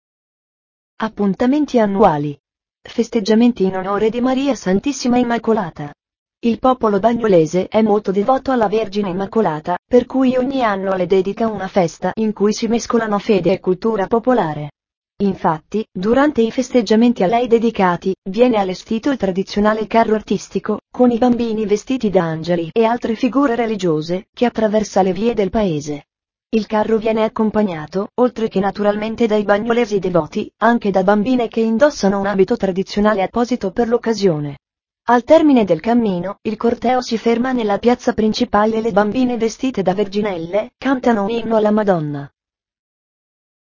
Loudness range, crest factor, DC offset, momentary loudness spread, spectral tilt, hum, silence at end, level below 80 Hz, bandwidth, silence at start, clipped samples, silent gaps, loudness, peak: 2 LU; 16 dB; under 0.1%; 7 LU; -6.5 dB/octave; none; 1.4 s; -46 dBFS; 7.4 kHz; 1 s; under 0.1%; 2.40-2.44 s, 6.19-6.26 s, 9.79-9.83 s, 14.97-15.02 s, 18.18-18.22 s, 24.29-24.33 s; -17 LUFS; 0 dBFS